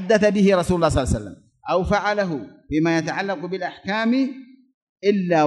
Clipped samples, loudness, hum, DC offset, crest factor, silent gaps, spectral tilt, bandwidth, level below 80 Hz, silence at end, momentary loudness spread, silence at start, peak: under 0.1%; -21 LUFS; none; under 0.1%; 18 dB; 4.74-4.96 s; -6 dB/octave; 12 kHz; -40 dBFS; 0 s; 10 LU; 0 s; -4 dBFS